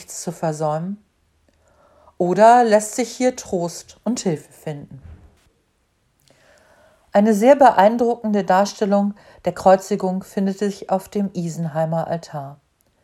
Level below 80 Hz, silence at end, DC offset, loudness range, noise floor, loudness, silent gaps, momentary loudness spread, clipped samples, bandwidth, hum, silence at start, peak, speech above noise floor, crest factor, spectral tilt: -58 dBFS; 0.5 s; under 0.1%; 10 LU; -65 dBFS; -19 LUFS; none; 17 LU; under 0.1%; 15 kHz; none; 0 s; 0 dBFS; 47 dB; 20 dB; -5.5 dB/octave